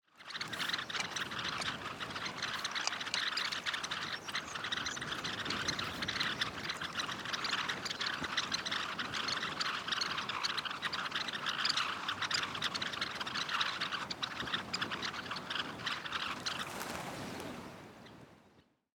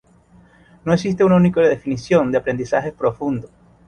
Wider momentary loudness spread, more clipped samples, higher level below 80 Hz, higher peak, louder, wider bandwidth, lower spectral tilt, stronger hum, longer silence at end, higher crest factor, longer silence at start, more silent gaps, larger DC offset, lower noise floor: second, 7 LU vs 11 LU; neither; second, -68 dBFS vs -50 dBFS; second, -14 dBFS vs -4 dBFS; second, -36 LUFS vs -18 LUFS; first, over 20 kHz vs 9.2 kHz; second, -1.5 dB/octave vs -7.5 dB/octave; neither; about the same, 0.35 s vs 0.4 s; first, 24 dB vs 16 dB; second, 0.15 s vs 0.85 s; neither; neither; first, -67 dBFS vs -51 dBFS